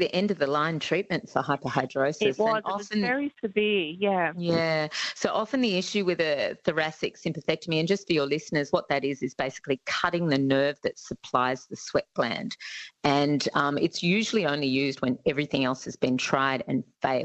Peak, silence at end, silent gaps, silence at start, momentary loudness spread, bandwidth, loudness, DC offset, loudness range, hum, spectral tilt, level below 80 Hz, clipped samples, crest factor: -8 dBFS; 0 s; none; 0 s; 6 LU; 8.4 kHz; -27 LUFS; under 0.1%; 2 LU; none; -5 dB/octave; -64 dBFS; under 0.1%; 18 dB